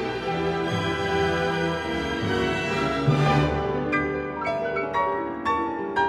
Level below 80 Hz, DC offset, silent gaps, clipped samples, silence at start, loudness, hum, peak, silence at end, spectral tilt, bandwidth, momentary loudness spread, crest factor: -44 dBFS; under 0.1%; none; under 0.1%; 0 s; -25 LUFS; none; -10 dBFS; 0 s; -6 dB/octave; 12 kHz; 5 LU; 16 dB